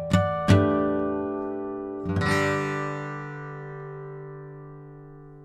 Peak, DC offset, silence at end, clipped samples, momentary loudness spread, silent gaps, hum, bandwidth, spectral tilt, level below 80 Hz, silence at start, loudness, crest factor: -4 dBFS; under 0.1%; 0 s; under 0.1%; 22 LU; none; none; 12.5 kHz; -7 dB/octave; -50 dBFS; 0 s; -26 LUFS; 22 dB